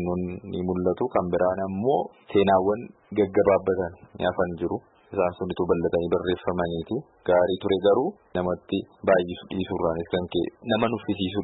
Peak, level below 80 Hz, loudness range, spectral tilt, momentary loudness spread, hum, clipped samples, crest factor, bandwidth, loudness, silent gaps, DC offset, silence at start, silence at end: -8 dBFS; -54 dBFS; 3 LU; -11 dB/octave; 10 LU; none; under 0.1%; 16 dB; 4.1 kHz; -25 LUFS; none; under 0.1%; 0 s; 0 s